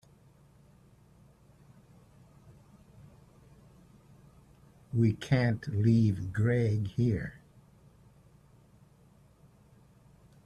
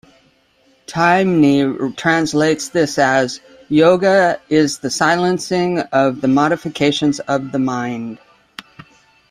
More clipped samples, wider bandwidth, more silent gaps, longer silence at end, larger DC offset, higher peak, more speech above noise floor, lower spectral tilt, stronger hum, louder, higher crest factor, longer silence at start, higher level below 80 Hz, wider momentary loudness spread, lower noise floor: neither; second, 9.6 kHz vs 14 kHz; neither; first, 3.1 s vs 0.7 s; neither; second, -14 dBFS vs -2 dBFS; second, 33 dB vs 41 dB; first, -8.5 dB/octave vs -5 dB/octave; neither; second, -29 LUFS vs -16 LUFS; about the same, 20 dB vs 16 dB; first, 4.95 s vs 0.9 s; second, -60 dBFS vs -54 dBFS; second, 7 LU vs 12 LU; first, -61 dBFS vs -56 dBFS